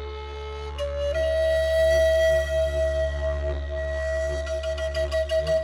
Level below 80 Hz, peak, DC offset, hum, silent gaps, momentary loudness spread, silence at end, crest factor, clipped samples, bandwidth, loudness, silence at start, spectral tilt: -32 dBFS; -12 dBFS; under 0.1%; none; none; 11 LU; 0 s; 12 dB; under 0.1%; 15.5 kHz; -25 LUFS; 0 s; -5 dB/octave